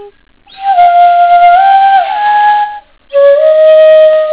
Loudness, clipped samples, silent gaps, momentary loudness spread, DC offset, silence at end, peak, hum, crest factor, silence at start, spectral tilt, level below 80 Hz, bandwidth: -6 LUFS; 3%; none; 8 LU; under 0.1%; 0 s; 0 dBFS; none; 6 dB; 0 s; -4.5 dB/octave; -52 dBFS; 4 kHz